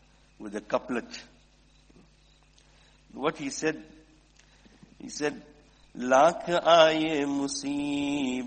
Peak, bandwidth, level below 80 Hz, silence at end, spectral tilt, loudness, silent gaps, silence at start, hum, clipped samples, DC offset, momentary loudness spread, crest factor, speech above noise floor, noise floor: -6 dBFS; 8.8 kHz; -62 dBFS; 0 s; -3.5 dB/octave; -26 LUFS; none; 0.4 s; none; under 0.1%; under 0.1%; 23 LU; 22 dB; 34 dB; -60 dBFS